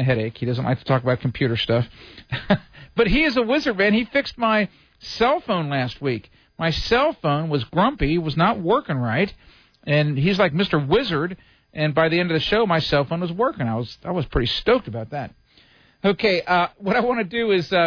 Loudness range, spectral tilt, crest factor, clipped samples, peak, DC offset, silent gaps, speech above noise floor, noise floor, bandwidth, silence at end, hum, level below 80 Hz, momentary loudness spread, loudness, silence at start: 2 LU; -7 dB/octave; 14 dB; under 0.1%; -8 dBFS; under 0.1%; none; 34 dB; -55 dBFS; 5.4 kHz; 0 s; none; -40 dBFS; 10 LU; -21 LUFS; 0 s